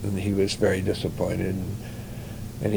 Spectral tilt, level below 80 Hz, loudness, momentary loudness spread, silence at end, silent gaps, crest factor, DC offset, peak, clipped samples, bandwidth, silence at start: -6 dB/octave; -46 dBFS; -27 LUFS; 14 LU; 0 s; none; 18 dB; under 0.1%; -8 dBFS; under 0.1%; over 20 kHz; 0 s